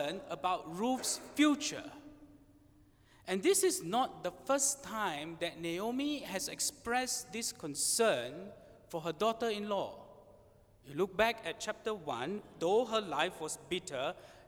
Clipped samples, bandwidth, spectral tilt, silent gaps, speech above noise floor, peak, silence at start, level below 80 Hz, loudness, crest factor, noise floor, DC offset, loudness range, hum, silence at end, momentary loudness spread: under 0.1%; over 20 kHz; -2.5 dB/octave; none; 29 dB; -14 dBFS; 0 s; -68 dBFS; -35 LUFS; 22 dB; -64 dBFS; under 0.1%; 3 LU; none; 0.05 s; 12 LU